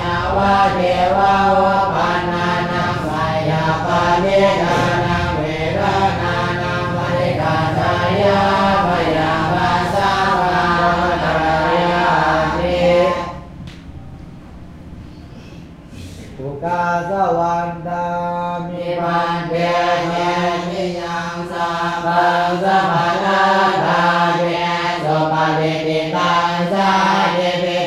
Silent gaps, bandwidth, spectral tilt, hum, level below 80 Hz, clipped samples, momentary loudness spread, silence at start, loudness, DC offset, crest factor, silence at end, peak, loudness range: none; 13.5 kHz; -6 dB/octave; none; -38 dBFS; under 0.1%; 11 LU; 0 s; -16 LUFS; under 0.1%; 14 dB; 0 s; -4 dBFS; 6 LU